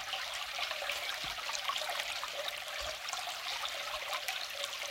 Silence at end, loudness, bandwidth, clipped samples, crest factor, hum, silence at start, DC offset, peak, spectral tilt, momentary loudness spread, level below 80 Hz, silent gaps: 0 s; -37 LUFS; 17 kHz; under 0.1%; 24 dB; none; 0 s; under 0.1%; -14 dBFS; 1 dB/octave; 3 LU; -66 dBFS; none